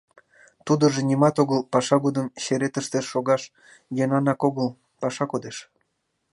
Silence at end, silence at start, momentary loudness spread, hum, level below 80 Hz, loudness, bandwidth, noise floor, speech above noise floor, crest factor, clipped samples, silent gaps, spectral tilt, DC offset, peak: 0.7 s; 0.65 s; 11 LU; none; -70 dBFS; -23 LUFS; 11.5 kHz; -75 dBFS; 52 dB; 20 dB; under 0.1%; none; -6 dB/octave; under 0.1%; -4 dBFS